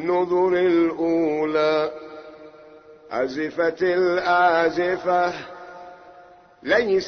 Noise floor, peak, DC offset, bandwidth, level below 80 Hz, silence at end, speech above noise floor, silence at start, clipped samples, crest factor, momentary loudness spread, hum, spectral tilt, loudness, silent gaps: -49 dBFS; -6 dBFS; under 0.1%; 6.6 kHz; -60 dBFS; 0 s; 28 dB; 0 s; under 0.1%; 16 dB; 20 LU; none; -6 dB/octave; -21 LUFS; none